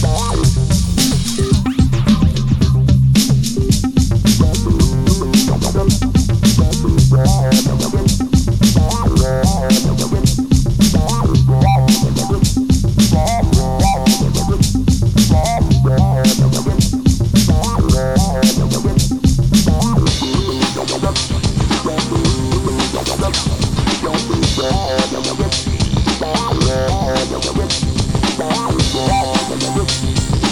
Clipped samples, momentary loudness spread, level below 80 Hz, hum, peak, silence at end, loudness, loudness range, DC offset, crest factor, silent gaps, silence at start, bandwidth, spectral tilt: under 0.1%; 5 LU; -22 dBFS; none; 0 dBFS; 0 s; -14 LUFS; 3 LU; under 0.1%; 12 dB; none; 0 s; 16 kHz; -5.5 dB/octave